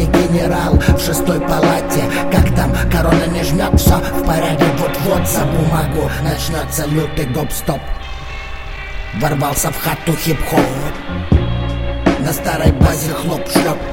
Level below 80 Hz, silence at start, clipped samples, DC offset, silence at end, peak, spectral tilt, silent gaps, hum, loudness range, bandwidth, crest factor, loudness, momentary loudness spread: -22 dBFS; 0 s; under 0.1%; 0.9%; 0 s; 0 dBFS; -5.5 dB/octave; none; none; 5 LU; 17 kHz; 14 dB; -16 LUFS; 10 LU